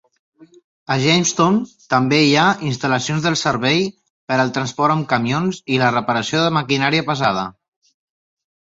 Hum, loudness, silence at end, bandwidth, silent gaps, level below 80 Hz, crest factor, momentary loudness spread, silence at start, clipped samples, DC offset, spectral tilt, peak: none; -17 LUFS; 1.2 s; 8 kHz; 4.10-4.27 s; -56 dBFS; 16 dB; 7 LU; 0.9 s; under 0.1%; under 0.1%; -4.5 dB/octave; -2 dBFS